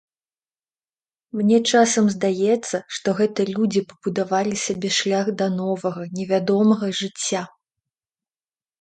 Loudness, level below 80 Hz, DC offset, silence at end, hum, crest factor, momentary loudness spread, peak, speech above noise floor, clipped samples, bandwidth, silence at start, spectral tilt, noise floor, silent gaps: -21 LUFS; -66 dBFS; under 0.1%; 1.35 s; none; 18 dB; 10 LU; -4 dBFS; over 69 dB; under 0.1%; 9.4 kHz; 1.35 s; -4.5 dB/octave; under -90 dBFS; none